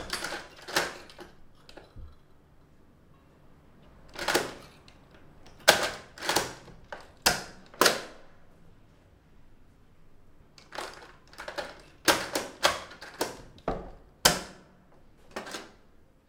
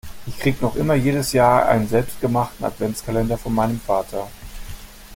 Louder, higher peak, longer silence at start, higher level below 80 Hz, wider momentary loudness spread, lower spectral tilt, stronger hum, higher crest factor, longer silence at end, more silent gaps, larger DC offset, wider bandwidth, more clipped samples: second, -29 LUFS vs -20 LUFS; about the same, 0 dBFS vs -2 dBFS; about the same, 0 s vs 0.05 s; second, -54 dBFS vs -38 dBFS; first, 24 LU vs 20 LU; second, -1.5 dB/octave vs -6 dB/octave; neither; first, 34 dB vs 18 dB; first, 0.6 s vs 0 s; neither; neither; about the same, 17.5 kHz vs 17 kHz; neither